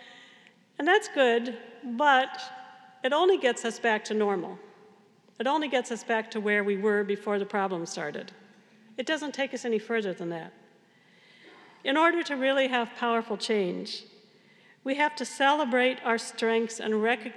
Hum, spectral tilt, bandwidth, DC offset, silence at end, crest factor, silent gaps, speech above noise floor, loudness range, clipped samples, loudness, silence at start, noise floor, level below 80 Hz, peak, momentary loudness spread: none; -3.5 dB/octave; 12 kHz; under 0.1%; 0 s; 20 dB; none; 33 dB; 6 LU; under 0.1%; -27 LUFS; 0 s; -60 dBFS; under -90 dBFS; -10 dBFS; 14 LU